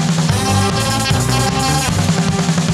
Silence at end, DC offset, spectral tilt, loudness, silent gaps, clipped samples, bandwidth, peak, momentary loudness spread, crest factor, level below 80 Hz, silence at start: 0 s; under 0.1%; -4.5 dB/octave; -15 LUFS; none; under 0.1%; 15.5 kHz; -2 dBFS; 1 LU; 14 dB; -32 dBFS; 0 s